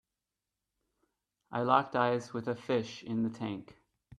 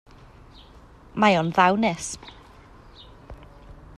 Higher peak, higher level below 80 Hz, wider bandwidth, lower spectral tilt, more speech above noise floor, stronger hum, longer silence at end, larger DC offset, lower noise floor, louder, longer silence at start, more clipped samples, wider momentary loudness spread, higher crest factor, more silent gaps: second, -10 dBFS vs -6 dBFS; second, -74 dBFS vs -50 dBFS; second, 10.5 kHz vs 12.5 kHz; first, -6.5 dB/octave vs -4.5 dB/octave; first, 57 dB vs 28 dB; neither; first, 0.55 s vs 0.25 s; neither; first, -89 dBFS vs -49 dBFS; second, -33 LUFS vs -21 LUFS; first, 1.5 s vs 1.15 s; neither; second, 12 LU vs 23 LU; about the same, 24 dB vs 22 dB; neither